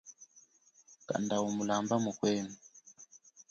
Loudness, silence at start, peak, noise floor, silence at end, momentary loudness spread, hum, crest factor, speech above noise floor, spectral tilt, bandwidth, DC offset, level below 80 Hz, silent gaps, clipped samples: -34 LUFS; 0.05 s; -18 dBFS; -65 dBFS; 0.1 s; 24 LU; none; 18 dB; 32 dB; -5 dB/octave; 7.8 kHz; under 0.1%; -74 dBFS; none; under 0.1%